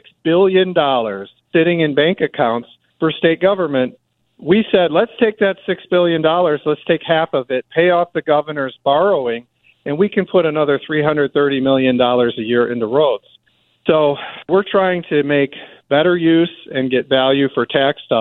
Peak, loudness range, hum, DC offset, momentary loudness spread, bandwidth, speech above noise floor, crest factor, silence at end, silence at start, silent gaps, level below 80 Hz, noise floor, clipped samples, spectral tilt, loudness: 0 dBFS; 1 LU; none; under 0.1%; 7 LU; 4.2 kHz; 41 dB; 16 dB; 0 s; 0.25 s; none; -58 dBFS; -56 dBFS; under 0.1%; -9.5 dB/octave; -16 LUFS